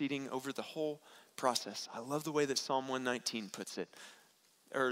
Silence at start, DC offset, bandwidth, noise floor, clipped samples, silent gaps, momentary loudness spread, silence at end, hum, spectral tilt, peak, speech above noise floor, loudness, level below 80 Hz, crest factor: 0 s; under 0.1%; 16 kHz; -68 dBFS; under 0.1%; none; 13 LU; 0 s; none; -3 dB/octave; -16 dBFS; 30 dB; -38 LUFS; -84 dBFS; 22 dB